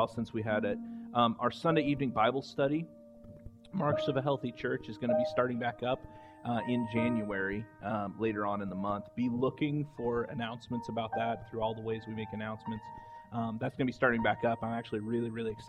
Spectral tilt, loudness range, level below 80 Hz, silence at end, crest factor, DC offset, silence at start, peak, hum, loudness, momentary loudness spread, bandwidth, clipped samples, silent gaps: -7.5 dB/octave; 4 LU; -62 dBFS; 0 s; 20 dB; under 0.1%; 0 s; -12 dBFS; none; -34 LUFS; 10 LU; 9.6 kHz; under 0.1%; none